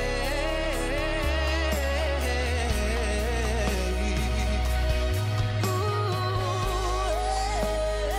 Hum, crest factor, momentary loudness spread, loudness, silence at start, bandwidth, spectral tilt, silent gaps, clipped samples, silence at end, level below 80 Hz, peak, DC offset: none; 12 dB; 1 LU; -27 LUFS; 0 s; 16 kHz; -5 dB/octave; none; under 0.1%; 0 s; -30 dBFS; -14 dBFS; under 0.1%